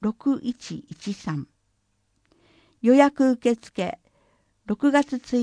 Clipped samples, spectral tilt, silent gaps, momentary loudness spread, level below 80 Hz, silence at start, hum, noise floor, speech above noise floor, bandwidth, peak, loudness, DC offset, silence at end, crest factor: under 0.1%; -6 dB/octave; none; 19 LU; -62 dBFS; 0 s; none; -70 dBFS; 48 dB; 10 kHz; -2 dBFS; -23 LUFS; under 0.1%; 0 s; 22 dB